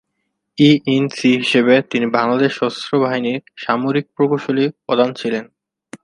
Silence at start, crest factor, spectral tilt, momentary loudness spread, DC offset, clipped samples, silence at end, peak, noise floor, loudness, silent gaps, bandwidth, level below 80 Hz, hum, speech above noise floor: 0.6 s; 16 dB; -6 dB/octave; 10 LU; under 0.1%; under 0.1%; 0.05 s; 0 dBFS; -73 dBFS; -17 LUFS; none; 10.5 kHz; -64 dBFS; none; 57 dB